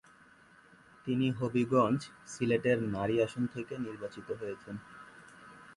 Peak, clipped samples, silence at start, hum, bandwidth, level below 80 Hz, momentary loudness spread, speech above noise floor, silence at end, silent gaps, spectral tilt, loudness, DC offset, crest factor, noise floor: -14 dBFS; under 0.1%; 1.05 s; none; 11.5 kHz; -66 dBFS; 23 LU; 28 dB; 0 s; none; -6.5 dB/octave; -33 LUFS; under 0.1%; 20 dB; -60 dBFS